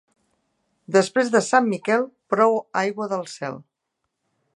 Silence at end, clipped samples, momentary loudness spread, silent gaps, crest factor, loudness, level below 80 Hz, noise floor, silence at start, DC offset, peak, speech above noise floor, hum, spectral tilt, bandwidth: 0.95 s; under 0.1%; 13 LU; none; 20 dB; -21 LUFS; -76 dBFS; -79 dBFS; 0.9 s; under 0.1%; -2 dBFS; 58 dB; none; -4.5 dB/octave; 11.5 kHz